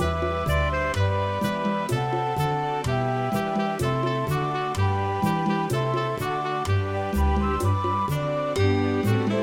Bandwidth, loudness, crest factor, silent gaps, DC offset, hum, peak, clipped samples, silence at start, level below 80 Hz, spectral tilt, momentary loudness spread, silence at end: 16.5 kHz; -25 LUFS; 12 dB; none; under 0.1%; none; -10 dBFS; under 0.1%; 0 s; -36 dBFS; -6.5 dB/octave; 3 LU; 0 s